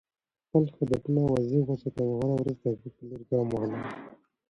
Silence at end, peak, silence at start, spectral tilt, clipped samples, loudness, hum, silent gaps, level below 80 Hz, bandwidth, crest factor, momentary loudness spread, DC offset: 0.35 s; -12 dBFS; 0.55 s; -9.5 dB/octave; under 0.1%; -29 LUFS; none; none; -58 dBFS; 10.5 kHz; 18 dB; 12 LU; under 0.1%